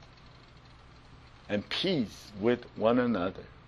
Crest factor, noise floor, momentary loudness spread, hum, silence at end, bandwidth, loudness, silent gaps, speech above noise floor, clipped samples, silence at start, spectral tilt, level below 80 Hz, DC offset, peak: 20 dB; -54 dBFS; 9 LU; none; 0.15 s; 12.5 kHz; -30 LUFS; none; 24 dB; under 0.1%; 0 s; -6 dB/octave; -58 dBFS; under 0.1%; -12 dBFS